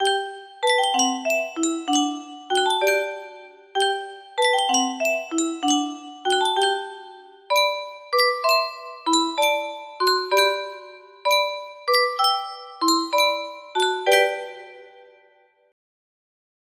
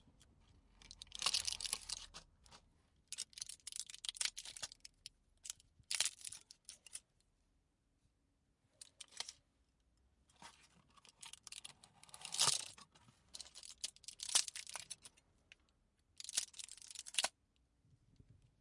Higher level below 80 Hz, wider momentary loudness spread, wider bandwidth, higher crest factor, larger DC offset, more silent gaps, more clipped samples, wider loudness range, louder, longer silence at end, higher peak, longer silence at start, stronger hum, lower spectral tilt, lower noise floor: about the same, -74 dBFS vs -76 dBFS; second, 12 LU vs 23 LU; first, 15.5 kHz vs 12 kHz; second, 18 dB vs 34 dB; neither; neither; neither; second, 2 LU vs 16 LU; first, -22 LUFS vs -42 LUFS; first, 1.85 s vs 0.25 s; first, -4 dBFS vs -14 dBFS; about the same, 0 s vs 0.05 s; neither; about the same, 0.5 dB/octave vs 1.5 dB/octave; second, -59 dBFS vs -81 dBFS